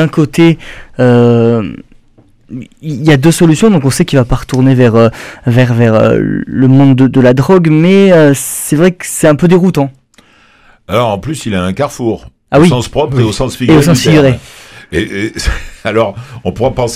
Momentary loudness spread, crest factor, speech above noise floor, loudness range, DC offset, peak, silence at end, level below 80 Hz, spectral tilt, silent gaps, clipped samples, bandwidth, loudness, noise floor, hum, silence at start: 12 LU; 10 dB; 37 dB; 5 LU; under 0.1%; 0 dBFS; 0 s; -30 dBFS; -6.5 dB/octave; none; 1%; 15.5 kHz; -9 LUFS; -45 dBFS; none; 0 s